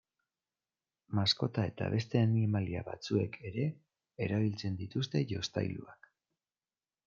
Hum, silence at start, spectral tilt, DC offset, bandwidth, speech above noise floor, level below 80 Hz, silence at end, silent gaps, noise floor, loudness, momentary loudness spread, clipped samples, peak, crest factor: none; 1.1 s; -6.5 dB/octave; under 0.1%; 7.4 kHz; over 57 dB; -70 dBFS; 1.15 s; none; under -90 dBFS; -34 LUFS; 9 LU; under 0.1%; -16 dBFS; 20 dB